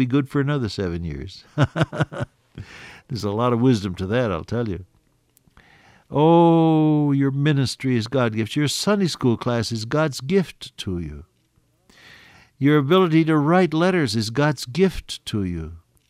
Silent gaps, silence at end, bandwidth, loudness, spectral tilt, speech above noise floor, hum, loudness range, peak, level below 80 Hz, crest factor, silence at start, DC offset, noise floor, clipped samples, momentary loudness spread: none; 0.3 s; 15 kHz; -21 LUFS; -6.5 dB/octave; 43 dB; none; 6 LU; -6 dBFS; -48 dBFS; 16 dB; 0 s; under 0.1%; -63 dBFS; under 0.1%; 16 LU